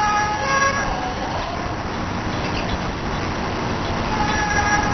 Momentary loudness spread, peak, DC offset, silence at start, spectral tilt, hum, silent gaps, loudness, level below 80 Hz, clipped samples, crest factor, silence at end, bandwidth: 7 LU; -6 dBFS; 0.5%; 0 s; -4 dB/octave; none; none; -22 LUFS; -32 dBFS; under 0.1%; 16 dB; 0 s; 6.4 kHz